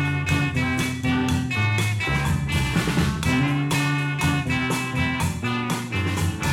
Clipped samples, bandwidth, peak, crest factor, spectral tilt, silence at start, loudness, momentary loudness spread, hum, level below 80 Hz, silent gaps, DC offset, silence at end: under 0.1%; 16.5 kHz; -8 dBFS; 14 dB; -5 dB/octave; 0 s; -23 LUFS; 3 LU; none; -38 dBFS; none; under 0.1%; 0 s